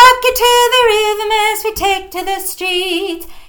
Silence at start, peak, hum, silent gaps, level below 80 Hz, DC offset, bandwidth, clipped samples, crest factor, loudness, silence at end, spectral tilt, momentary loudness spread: 0 s; 0 dBFS; none; none; -38 dBFS; under 0.1%; 19.5 kHz; 0.7%; 12 dB; -13 LUFS; 0.05 s; -0.5 dB/octave; 10 LU